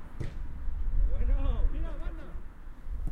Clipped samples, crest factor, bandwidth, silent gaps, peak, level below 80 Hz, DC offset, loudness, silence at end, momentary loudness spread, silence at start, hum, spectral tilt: under 0.1%; 14 dB; 3.8 kHz; none; -14 dBFS; -30 dBFS; under 0.1%; -36 LUFS; 0 s; 15 LU; 0 s; none; -8.5 dB/octave